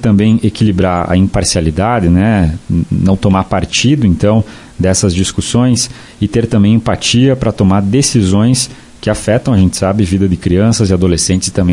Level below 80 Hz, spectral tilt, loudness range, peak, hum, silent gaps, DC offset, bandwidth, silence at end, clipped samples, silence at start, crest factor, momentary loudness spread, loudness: -32 dBFS; -5.5 dB/octave; 1 LU; 0 dBFS; none; none; under 0.1%; 11.5 kHz; 0 s; under 0.1%; 0 s; 10 dB; 5 LU; -11 LUFS